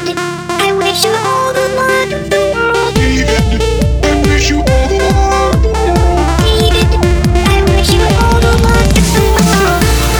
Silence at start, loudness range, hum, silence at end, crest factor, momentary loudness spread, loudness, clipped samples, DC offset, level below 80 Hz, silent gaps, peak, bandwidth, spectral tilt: 0 s; 2 LU; none; 0 s; 10 dB; 3 LU; -11 LUFS; under 0.1%; under 0.1%; -14 dBFS; none; 0 dBFS; over 20 kHz; -5 dB/octave